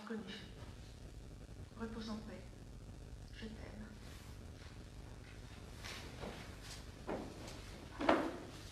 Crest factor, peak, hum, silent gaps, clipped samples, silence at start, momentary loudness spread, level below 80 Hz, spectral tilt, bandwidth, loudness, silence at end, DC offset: 32 dB; -14 dBFS; none; none; under 0.1%; 0 s; 15 LU; -56 dBFS; -5 dB/octave; 14.5 kHz; -47 LUFS; 0 s; under 0.1%